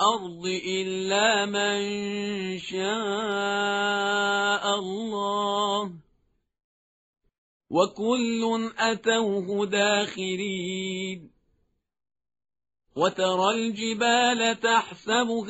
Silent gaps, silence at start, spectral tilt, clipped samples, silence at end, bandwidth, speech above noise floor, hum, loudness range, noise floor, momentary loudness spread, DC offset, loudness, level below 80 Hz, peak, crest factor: 6.64-7.13 s, 7.38-7.60 s; 0 s; -2 dB/octave; under 0.1%; 0 s; 8 kHz; 46 dB; none; 5 LU; -72 dBFS; 8 LU; under 0.1%; -25 LUFS; -68 dBFS; -8 dBFS; 18 dB